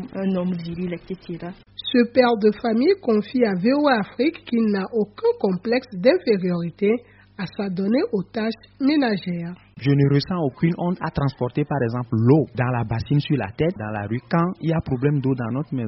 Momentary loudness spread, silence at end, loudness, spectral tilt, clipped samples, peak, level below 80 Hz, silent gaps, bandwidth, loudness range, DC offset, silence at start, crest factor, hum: 11 LU; 0 s; -22 LUFS; -6.5 dB/octave; under 0.1%; -2 dBFS; -50 dBFS; none; 5.8 kHz; 3 LU; under 0.1%; 0 s; 18 dB; none